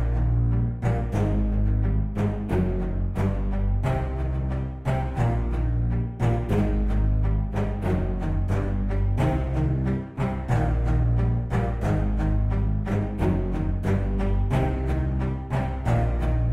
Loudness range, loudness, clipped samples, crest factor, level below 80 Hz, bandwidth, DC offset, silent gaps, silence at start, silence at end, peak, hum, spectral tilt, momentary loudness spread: 1 LU; -26 LUFS; under 0.1%; 14 dB; -26 dBFS; 8 kHz; under 0.1%; none; 0 s; 0 s; -10 dBFS; none; -9 dB/octave; 4 LU